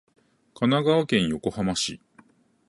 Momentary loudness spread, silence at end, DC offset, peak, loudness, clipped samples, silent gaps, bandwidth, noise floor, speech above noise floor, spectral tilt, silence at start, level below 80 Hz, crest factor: 7 LU; 0.75 s; under 0.1%; -8 dBFS; -24 LUFS; under 0.1%; none; 11.5 kHz; -58 dBFS; 34 dB; -5 dB/octave; 0.6 s; -54 dBFS; 18 dB